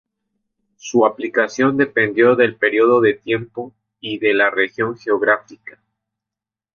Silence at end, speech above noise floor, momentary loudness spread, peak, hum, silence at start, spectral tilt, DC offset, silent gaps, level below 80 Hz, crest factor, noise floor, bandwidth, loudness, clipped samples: 1.05 s; 71 dB; 15 LU; -2 dBFS; none; 0.85 s; -5.5 dB/octave; under 0.1%; none; -62 dBFS; 16 dB; -87 dBFS; 7.2 kHz; -17 LUFS; under 0.1%